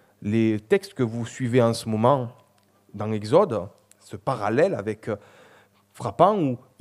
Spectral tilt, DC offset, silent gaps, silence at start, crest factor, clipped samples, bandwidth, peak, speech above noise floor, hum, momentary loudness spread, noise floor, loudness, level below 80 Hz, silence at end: -7 dB/octave; under 0.1%; none; 0.2 s; 22 dB; under 0.1%; 13.5 kHz; -4 dBFS; 37 dB; none; 14 LU; -60 dBFS; -24 LUFS; -66 dBFS; 0.25 s